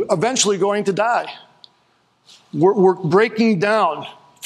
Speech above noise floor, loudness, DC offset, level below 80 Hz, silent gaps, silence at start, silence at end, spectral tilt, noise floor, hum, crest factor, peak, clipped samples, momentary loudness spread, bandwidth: 43 dB; -17 LUFS; under 0.1%; -68 dBFS; none; 0 s; 0 s; -4.5 dB/octave; -61 dBFS; none; 16 dB; -2 dBFS; under 0.1%; 15 LU; 12 kHz